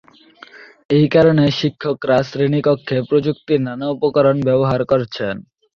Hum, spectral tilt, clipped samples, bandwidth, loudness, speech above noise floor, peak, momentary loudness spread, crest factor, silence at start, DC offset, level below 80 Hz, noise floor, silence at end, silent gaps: none; -8 dB/octave; under 0.1%; 7 kHz; -17 LUFS; 28 dB; -2 dBFS; 10 LU; 14 dB; 0.55 s; under 0.1%; -52 dBFS; -44 dBFS; 0.35 s; 0.85-0.89 s